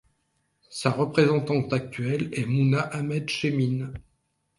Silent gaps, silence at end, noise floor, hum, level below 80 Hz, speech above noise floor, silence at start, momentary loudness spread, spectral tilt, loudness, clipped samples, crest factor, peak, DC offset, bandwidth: none; 0.6 s; -73 dBFS; none; -58 dBFS; 48 dB; 0.7 s; 8 LU; -6.5 dB/octave; -25 LUFS; under 0.1%; 20 dB; -6 dBFS; under 0.1%; 11.5 kHz